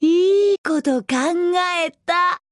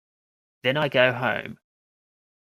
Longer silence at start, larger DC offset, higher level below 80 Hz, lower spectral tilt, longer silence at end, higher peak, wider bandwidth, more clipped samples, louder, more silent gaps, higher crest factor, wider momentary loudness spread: second, 0 s vs 0.65 s; neither; about the same, -68 dBFS vs -68 dBFS; second, -3 dB/octave vs -6.5 dB/octave; second, 0.15 s vs 0.85 s; about the same, -6 dBFS vs -4 dBFS; second, 11.5 kHz vs 14 kHz; neither; first, -19 LUFS vs -23 LUFS; first, 0.58-0.64 s vs none; second, 12 dB vs 22 dB; second, 5 LU vs 11 LU